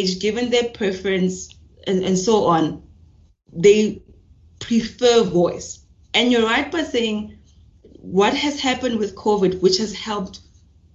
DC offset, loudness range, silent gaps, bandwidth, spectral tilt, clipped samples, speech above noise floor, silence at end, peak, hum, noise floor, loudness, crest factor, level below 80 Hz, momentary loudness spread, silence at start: under 0.1%; 2 LU; none; 8 kHz; -4.5 dB/octave; under 0.1%; 33 dB; 0.55 s; -2 dBFS; none; -52 dBFS; -19 LUFS; 18 dB; -50 dBFS; 17 LU; 0 s